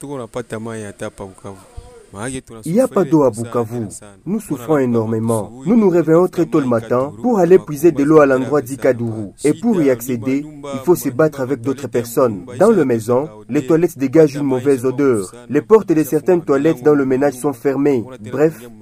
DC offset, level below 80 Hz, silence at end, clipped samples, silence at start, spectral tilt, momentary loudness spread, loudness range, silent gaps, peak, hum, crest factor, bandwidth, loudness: under 0.1%; -50 dBFS; 0.05 s; under 0.1%; 0 s; -7 dB/octave; 14 LU; 6 LU; none; 0 dBFS; none; 16 dB; 15.5 kHz; -16 LUFS